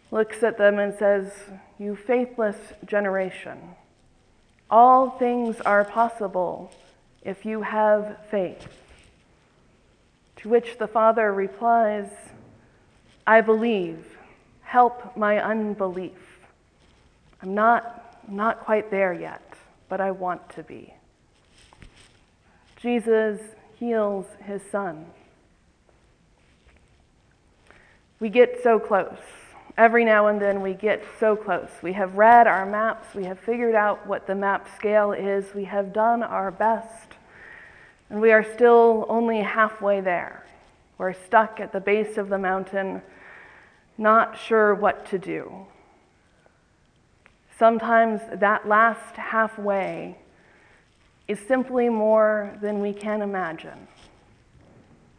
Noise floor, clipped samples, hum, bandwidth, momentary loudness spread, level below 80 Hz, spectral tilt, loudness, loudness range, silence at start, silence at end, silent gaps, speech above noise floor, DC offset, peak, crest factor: -61 dBFS; under 0.1%; none; 10.5 kHz; 17 LU; -62 dBFS; -6.5 dB/octave; -22 LUFS; 8 LU; 0.1 s; 1.35 s; none; 39 dB; under 0.1%; -2 dBFS; 22 dB